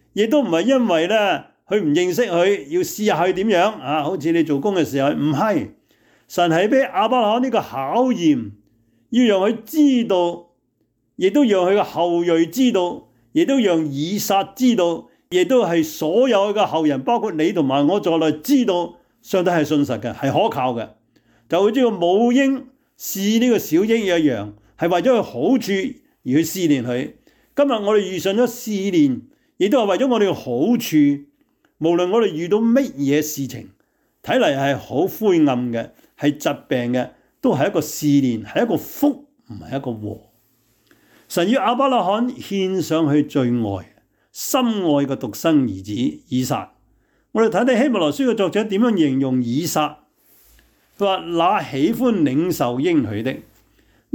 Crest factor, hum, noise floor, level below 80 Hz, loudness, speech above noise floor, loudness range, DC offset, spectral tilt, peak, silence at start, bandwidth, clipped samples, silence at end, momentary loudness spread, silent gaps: 12 dB; none; -67 dBFS; -62 dBFS; -19 LUFS; 49 dB; 3 LU; under 0.1%; -5.5 dB/octave; -6 dBFS; 0.15 s; 19.5 kHz; under 0.1%; 0.75 s; 9 LU; none